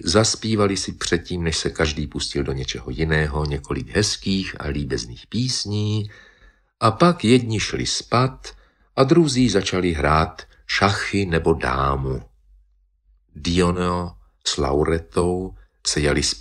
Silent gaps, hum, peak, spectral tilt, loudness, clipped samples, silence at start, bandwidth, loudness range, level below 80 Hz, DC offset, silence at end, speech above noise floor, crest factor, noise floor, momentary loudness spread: none; none; -2 dBFS; -4.5 dB/octave; -21 LUFS; under 0.1%; 0 s; 12.5 kHz; 5 LU; -36 dBFS; under 0.1%; 0 s; 39 dB; 20 dB; -60 dBFS; 10 LU